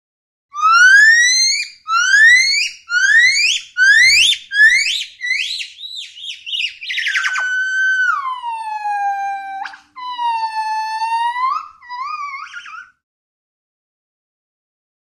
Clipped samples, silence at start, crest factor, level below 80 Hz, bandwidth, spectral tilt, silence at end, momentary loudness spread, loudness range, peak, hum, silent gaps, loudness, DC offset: under 0.1%; 0.55 s; 14 dB; -60 dBFS; 15.5 kHz; 5 dB/octave; 2.3 s; 20 LU; 14 LU; -2 dBFS; none; none; -12 LUFS; under 0.1%